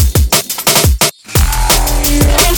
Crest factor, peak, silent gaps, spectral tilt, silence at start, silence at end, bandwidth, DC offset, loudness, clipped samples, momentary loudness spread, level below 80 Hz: 10 dB; 0 dBFS; none; -3 dB/octave; 0 s; 0 s; over 20 kHz; under 0.1%; -11 LUFS; under 0.1%; 4 LU; -14 dBFS